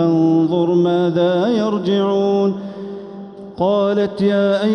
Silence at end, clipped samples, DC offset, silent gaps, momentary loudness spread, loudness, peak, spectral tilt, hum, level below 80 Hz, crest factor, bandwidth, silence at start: 0 s; under 0.1%; under 0.1%; none; 15 LU; -16 LUFS; -4 dBFS; -8 dB/octave; none; -58 dBFS; 12 dB; 6.6 kHz; 0 s